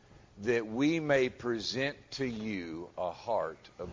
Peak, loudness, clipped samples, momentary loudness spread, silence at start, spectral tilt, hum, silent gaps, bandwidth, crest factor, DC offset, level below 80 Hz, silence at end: -14 dBFS; -33 LUFS; under 0.1%; 10 LU; 0.15 s; -5.5 dB/octave; none; none; 7.6 kHz; 20 dB; under 0.1%; -62 dBFS; 0 s